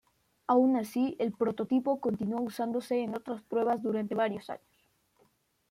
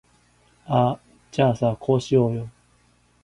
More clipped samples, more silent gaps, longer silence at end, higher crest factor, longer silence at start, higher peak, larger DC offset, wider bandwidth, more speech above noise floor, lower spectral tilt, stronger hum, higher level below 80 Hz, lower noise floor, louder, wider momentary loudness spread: neither; neither; first, 1.15 s vs 0.75 s; about the same, 16 dB vs 18 dB; second, 0.5 s vs 0.7 s; second, -14 dBFS vs -6 dBFS; neither; first, 15.5 kHz vs 11 kHz; about the same, 41 dB vs 40 dB; about the same, -7 dB/octave vs -7.5 dB/octave; second, none vs 60 Hz at -40 dBFS; second, -74 dBFS vs -54 dBFS; first, -71 dBFS vs -61 dBFS; second, -31 LUFS vs -22 LUFS; about the same, 11 LU vs 12 LU